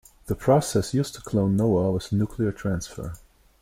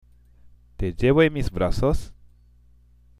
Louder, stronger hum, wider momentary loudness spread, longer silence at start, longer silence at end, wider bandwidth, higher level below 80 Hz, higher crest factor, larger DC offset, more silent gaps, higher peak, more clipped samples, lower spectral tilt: about the same, -24 LUFS vs -23 LUFS; second, none vs 60 Hz at -50 dBFS; about the same, 12 LU vs 13 LU; second, 0.25 s vs 0.8 s; second, 0.45 s vs 1.1 s; first, 16.5 kHz vs 13.5 kHz; second, -46 dBFS vs -34 dBFS; about the same, 16 dB vs 20 dB; neither; neither; second, -8 dBFS vs -4 dBFS; neither; about the same, -6.5 dB/octave vs -7 dB/octave